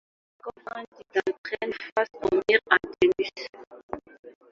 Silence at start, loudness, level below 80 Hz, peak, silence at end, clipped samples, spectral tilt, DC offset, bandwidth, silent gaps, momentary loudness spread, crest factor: 0.45 s; -25 LUFS; -62 dBFS; -2 dBFS; 0.2 s; under 0.1%; -4.5 dB/octave; under 0.1%; 7.4 kHz; 0.88-0.92 s, 1.38-1.44 s, 1.92-1.96 s, 3.49-3.53 s, 3.67-3.71 s, 3.83-3.89 s, 4.19-4.23 s; 19 LU; 26 dB